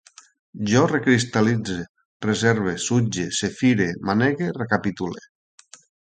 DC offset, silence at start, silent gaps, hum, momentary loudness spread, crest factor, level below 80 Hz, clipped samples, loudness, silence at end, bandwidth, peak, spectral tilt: under 0.1%; 0.55 s; 1.89-1.95 s, 2.05-2.20 s; none; 11 LU; 20 dB; -54 dBFS; under 0.1%; -22 LUFS; 0.9 s; 9.4 kHz; -2 dBFS; -5 dB/octave